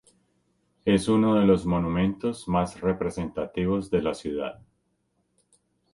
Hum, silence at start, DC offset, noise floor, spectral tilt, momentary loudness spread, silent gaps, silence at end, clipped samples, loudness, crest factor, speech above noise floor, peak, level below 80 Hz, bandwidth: none; 0.85 s; under 0.1%; -73 dBFS; -7 dB/octave; 10 LU; none; 1.4 s; under 0.1%; -25 LUFS; 18 dB; 48 dB; -8 dBFS; -48 dBFS; 11.5 kHz